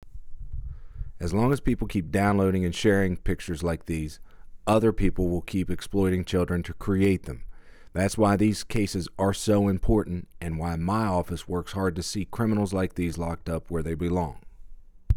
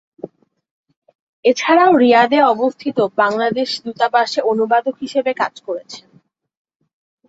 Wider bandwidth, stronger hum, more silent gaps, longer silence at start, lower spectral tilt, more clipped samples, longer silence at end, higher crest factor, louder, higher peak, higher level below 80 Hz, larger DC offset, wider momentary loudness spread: first, 17.5 kHz vs 8 kHz; neither; second, none vs 0.71-0.84 s, 0.97-1.02 s, 1.15-1.43 s; second, 0 s vs 0.25 s; first, -6.5 dB/octave vs -4.5 dB/octave; neither; second, 0 s vs 1.3 s; about the same, 16 dB vs 16 dB; second, -27 LUFS vs -15 LUFS; second, -10 dBFS vs -2 dBFS; first, -38 dBFS vs -66 dBFS; neither; second, 12 LU vs 17 LU